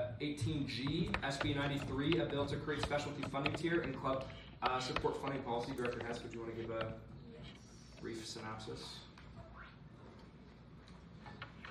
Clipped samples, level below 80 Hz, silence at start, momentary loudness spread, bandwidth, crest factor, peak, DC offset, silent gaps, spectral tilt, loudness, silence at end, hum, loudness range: under 0.1%; -58 dBFS; 0 s; 20 LU; 14 kHz; 24 dB; -18 dBFS; under 0.1%; none; -5.5 dB/octave; -40 LUFS; 0 s; none; 12 LU